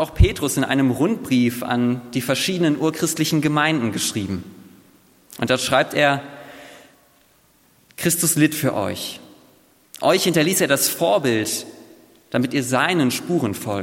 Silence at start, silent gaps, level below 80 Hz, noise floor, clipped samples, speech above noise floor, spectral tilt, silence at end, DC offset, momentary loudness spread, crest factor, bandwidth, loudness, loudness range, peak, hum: 0 s; none; -36 dBFS; -57 dBFS; under 0.1%; 38 dB; -4 dB/octave; 0 s; under 0.1%; 10 LU; 20 dB; 17 kHz; -20 LUFS; 4 LU; -2 dBFS; none